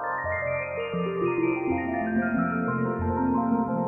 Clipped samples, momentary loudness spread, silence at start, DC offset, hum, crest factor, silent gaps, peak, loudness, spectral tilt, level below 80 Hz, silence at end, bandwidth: under 0.1%; 4 LU; 0 s; under 0.1%; none; 14 dB; none; -12 dBFS; -27 LUFS; -10.5 dB/octave; -50 dBFS; 0 s; 3 kHz